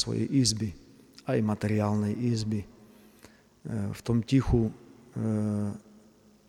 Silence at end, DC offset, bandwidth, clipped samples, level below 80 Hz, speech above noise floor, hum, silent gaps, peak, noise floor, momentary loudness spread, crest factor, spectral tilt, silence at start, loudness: 0.7 s; under 0.1%; 14 kHz; under 0.1%; -46 dBFS; 31 dB; 50 Hz at -55 dBFS; none; -12 dBFS; -58 dBFS; 13 LU; 18 dB; -6 dB/octave; 0 s; -29 LUFS